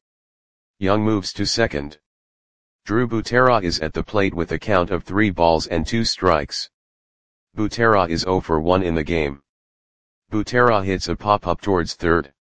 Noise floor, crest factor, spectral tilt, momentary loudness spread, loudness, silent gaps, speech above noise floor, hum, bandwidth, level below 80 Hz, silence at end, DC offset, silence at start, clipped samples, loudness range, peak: under -90 dBFS; 20 dB; -5.5 dB/octave; 10 LU; -20 LUFS; 2.06-2.79 s, 6.74-7.47 s, 9.49-10.22 s; over 71 dB; none; 9.8 kHz; -40 dBFS; 0.1 s; 2%; 0.7 s; under 0.1%; 2 LU; 0 dBFS